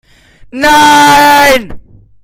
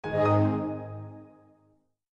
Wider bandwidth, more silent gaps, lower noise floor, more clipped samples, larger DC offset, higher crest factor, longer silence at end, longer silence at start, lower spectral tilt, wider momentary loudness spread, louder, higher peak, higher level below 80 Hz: first, 17 kHz vs 6.8 kHz; neither; second, -27 dBFS vs -67 dBFS; first, 0.8% vs under 0.1%; neither; second, 8 dB vs 18 dB; second, 0.45 s vs 0.85 s; first, 0.55 s vs 0.05 s; second, -2.5 dB/octave vs -9.5 dB/octave; second, 9 LU vs 21 LU; first, -5 LUFS vs -27 LUFS; first, 0 dBFS vs -12 dBFS; first, -34 dBFS vs -62 dBFS